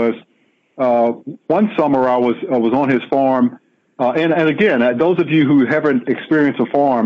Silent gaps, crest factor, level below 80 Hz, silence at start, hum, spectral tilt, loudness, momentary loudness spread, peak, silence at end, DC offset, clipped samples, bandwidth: none; 10 dB; -62 dBFS; 0 s; none; -8.5 dB/octave; -15 LUFS; 6 LU; -4 dBFS; 0 s; under 0.1%; under 0.1%; 6.6 kHz